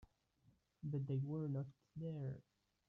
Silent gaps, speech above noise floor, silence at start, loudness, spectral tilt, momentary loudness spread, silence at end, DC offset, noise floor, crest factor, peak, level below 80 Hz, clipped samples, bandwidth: none; 32 dB; 0 s; -46 LUFS; -11 dB/octave; 10 LU; 0.45 s; under 0.1%; -76 dBFS; 14 dB; -32 dBFS; -76 dBFS; under 0.1%; 3.7 kHz